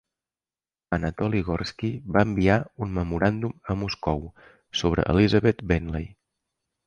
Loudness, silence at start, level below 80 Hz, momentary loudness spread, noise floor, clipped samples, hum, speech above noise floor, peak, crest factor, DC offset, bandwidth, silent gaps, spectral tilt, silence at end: -25 LUFS; 0.9 s; -40 dBFS; 11 LU; under -90 dBFS; under 0.1%; none; over 66 dB; -6 dBFS; 20 dB; under 0.1%; 9 kHz; none; -7 dB/octave; 0.75 s